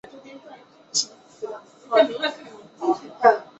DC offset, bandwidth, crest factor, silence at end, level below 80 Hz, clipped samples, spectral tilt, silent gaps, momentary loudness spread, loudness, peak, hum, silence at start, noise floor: under 0.1%; 8.4 kHz; 22 dB; 0.15 s; -74 dBFS; under 0.1%; -1.5 dB/octave; none; 24 LU; -22 LUFS; -2 dBFS; none; 0.15 s; -47 dBFS